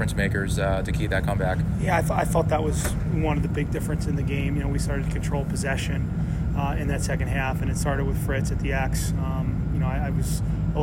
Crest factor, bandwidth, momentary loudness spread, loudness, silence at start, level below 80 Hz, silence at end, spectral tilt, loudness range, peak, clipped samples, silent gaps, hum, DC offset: 14 dB; 16.5 kHz; 4 LU; -25 LUFS; 0 s; -30 dBFS; 0 s; -6 dB/octave; 2 LU; -10 dBFS; under 0.1%; none; none; under 0.1%